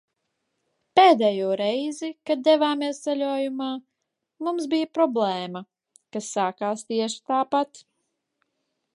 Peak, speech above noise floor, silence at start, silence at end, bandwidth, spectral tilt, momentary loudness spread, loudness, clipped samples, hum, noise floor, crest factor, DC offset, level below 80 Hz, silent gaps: -4 dBFS; 57 dB; 0.95 s; 1.15 s; 11.5 kHz; -4 dB/octave; 14 LU; -24 LUFS; under 0.1%; none; -81 dBFS; 20 dB; under 0.1%; -80 dBFS; none